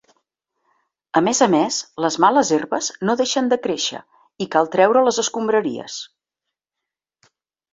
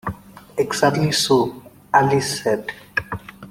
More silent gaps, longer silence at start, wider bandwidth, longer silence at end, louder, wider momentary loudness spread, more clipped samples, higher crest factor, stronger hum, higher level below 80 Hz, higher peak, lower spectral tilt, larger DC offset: neither; first, 1.15 s vs 0.05 s; second, 8 kHz vs 16.5 kHz; first, 1.65 s vs 0 s; about the same, -19 LUFS vs -20 LUFS; about the same, 14 LU vs 15 LU; neither; about the same, 20 dB vs 18 dB; neither; second, -66 dBFS vs -52 dBFS; about the same, -2 dBFS vs -2 dBFS; about the same, -3.5 dB/octave vs -4 dB/octave; neither